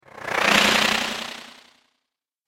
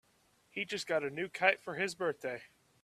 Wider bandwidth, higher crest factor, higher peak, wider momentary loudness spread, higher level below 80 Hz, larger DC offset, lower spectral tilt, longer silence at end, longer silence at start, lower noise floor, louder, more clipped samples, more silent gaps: first, 16.5 kHz vs 14 kHz; about the same, 22 dB vs 26 dB; first, -2 dBFS vs -12 dBFS; first, 17 LU vs 12 LU; first, -54 dBFS vs -78 dBFS; neither; second, -1.5 dB/octave vs -3.5 dB/octave; first, 0.95 s vs 0.35 s; second, 0.15 s vs 0.55 s; first, -81 dBFS vs -71 dBFS; first, -19 LUFS vs -35 LUFS; neither; neither